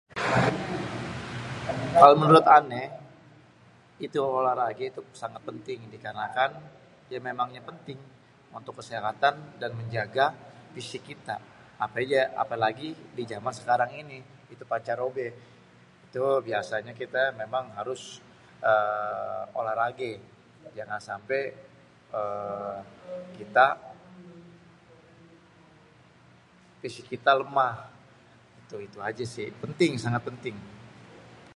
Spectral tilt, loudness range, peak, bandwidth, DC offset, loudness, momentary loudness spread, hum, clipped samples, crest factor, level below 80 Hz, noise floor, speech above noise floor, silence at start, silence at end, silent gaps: -5.5 dB/octave; 12 LU; 0 dBFS; 11.5 kHz; under 0.1%; -27 LUFS; 19 LU; none; under 0.1%; 28 dB; -62 dBFS; -57 dBFS; 30 dB; 0.15 s; 0.2 s; none